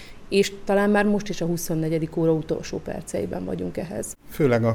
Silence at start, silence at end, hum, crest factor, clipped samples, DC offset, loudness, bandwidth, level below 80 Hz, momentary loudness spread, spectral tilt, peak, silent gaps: 0 s; 0 s; none; 18 dB; under 0.1%; under 0.1%; -25 LUFS; 18 kHz; -46 dBFS; 11 LU; -6 dB/octave; -6 dBFS; none